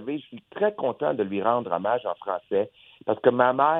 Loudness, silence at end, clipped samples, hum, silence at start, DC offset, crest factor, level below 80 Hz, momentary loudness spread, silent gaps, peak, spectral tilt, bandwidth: -26 LUFS; 0 s; under 0.1%; none; 0 s; under 0.1%; 20 dB; -74 dBFS; 14 LU; none; -4 dBFS; -9 dB/octave; 4 kHz